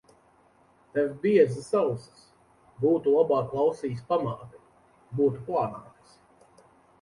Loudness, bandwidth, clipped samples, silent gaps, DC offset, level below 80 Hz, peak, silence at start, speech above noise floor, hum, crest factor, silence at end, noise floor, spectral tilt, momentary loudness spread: -26 LUFS; 11.5 kHz; under 0.1%; none; under 0.1%; -66 dBFS; -8 dBFS; 0.95 s; 36 dB; none; 20 dB; 1.2 s; -61 dBFS; -8 dB/octave; 12 LU